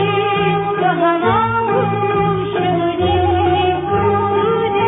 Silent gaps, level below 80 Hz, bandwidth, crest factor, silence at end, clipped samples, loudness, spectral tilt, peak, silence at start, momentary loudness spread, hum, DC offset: none; -40 dBFS; 3.9 kHz; 10 dB; 0 s; under 0.1%; -16 LUFS; -10.5 dB/octave; -4 dBFS; 0 s; 2 LU; none; under 0.1%